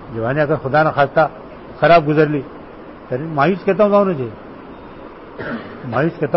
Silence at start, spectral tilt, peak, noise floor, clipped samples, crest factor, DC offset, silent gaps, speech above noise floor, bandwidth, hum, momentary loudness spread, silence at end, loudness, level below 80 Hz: 0 s; -11 dB/octave; -2 dBFS; -36 dBFS; under 0.1%; 14 dB; under 0.1%; none; 20 dB; 5.8 kHz; none; 23 LU; 0 s; -16 LUFS; -46 dBFS